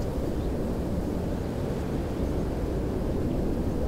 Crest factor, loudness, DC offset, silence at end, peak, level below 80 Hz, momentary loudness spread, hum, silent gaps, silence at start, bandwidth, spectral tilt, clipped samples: 12 dB; -30 LUFS; under 0.1%; 0 s; -16 dBFS; -34 dBFS; 2 LU; none; none; 0 s; 16 kHz; -8 dB/octave; under 0.1%